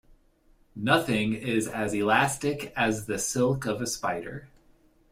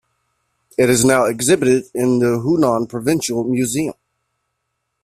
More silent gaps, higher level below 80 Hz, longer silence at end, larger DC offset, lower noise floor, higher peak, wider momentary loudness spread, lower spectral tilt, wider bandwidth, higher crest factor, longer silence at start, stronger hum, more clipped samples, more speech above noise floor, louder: neither; about the same, -56 dBFS vs -52 dBFS; second, 0.65 s vs 1.1 s; neither; second, -62 dBFS vs -74 dBFS; second, -8 dBFS vs -2 dBFS; first, 10 LU vs 6 LU; about the same, -4 dB/octave vs -5 dB/octave; about the same, 16 kHz vs 15.5 kHz; about the same, 20 dB vs 16 dB; about the same, 0.75 s vs 0.8 s; neither; neither; second, 35 dB vs 58 dB; second, -27 LUFS vs -17 LUFS